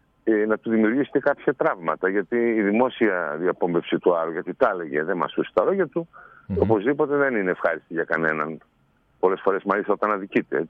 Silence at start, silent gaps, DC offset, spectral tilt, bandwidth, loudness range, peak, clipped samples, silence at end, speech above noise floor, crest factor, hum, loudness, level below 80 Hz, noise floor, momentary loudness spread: 0.25 s; none; under 0.1%; -9 dB/octave; 4.7 kHz; 2 LU; -6 dBFS; under 0.1%; 0 s; 40 dB; 18 dB; none; -23 LUFS; -58 dBFS; -63 dBFS; 5 LU